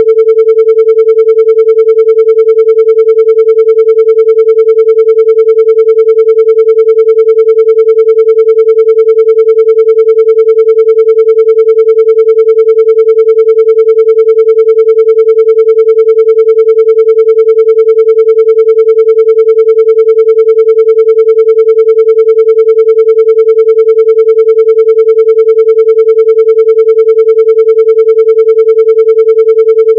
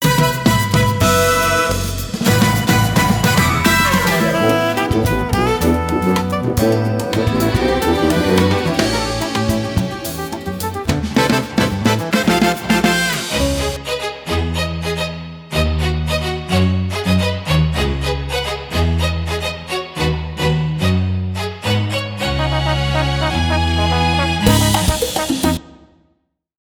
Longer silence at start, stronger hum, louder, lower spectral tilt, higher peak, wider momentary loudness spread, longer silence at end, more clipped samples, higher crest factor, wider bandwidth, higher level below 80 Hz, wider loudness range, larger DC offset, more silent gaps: about the same, 0 s vs 0 s; first, 60 Hz at -90 dBFS vs none; first, -5 LUFS vs -17 LUFS; second, -3.5 dB/octave vs -5 dB/octave; about the same, 0 dBFS vs 0 dBFS; second, 0 LU vs 8 LU; second, 0 s vs 0.9 s; first, 9% vs under 0.1%; second, 4 dB vs 16 dB; second, 3.3 kHz vs over 20 kHz; second, under -90 dBFS vs -28 dBFS; second, 0 LU vs 5 LU; neither; neither